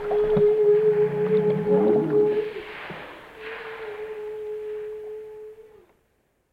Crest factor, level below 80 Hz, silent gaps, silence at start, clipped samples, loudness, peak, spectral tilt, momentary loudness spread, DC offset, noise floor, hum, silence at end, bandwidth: 14 dB; -54 dBFS; none; 0 s; under 0.1%; -22 LUFS; -10 dBFS; -8.5 dB/octave; 20 LU; under 0.1%; -68 dBFS; none; 0.9 s; 4.7 kHz